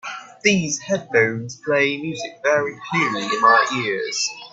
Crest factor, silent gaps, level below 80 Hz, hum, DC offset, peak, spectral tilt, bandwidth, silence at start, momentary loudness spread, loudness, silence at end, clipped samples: 18 dB; none; -62 dBFS; none; under 0.1%; -2 dBFS; -3.5 dB/octave; 8.4 kHz; 0.05 s; 9 LU; -20 LUFS; 0.05 s; under 0.1%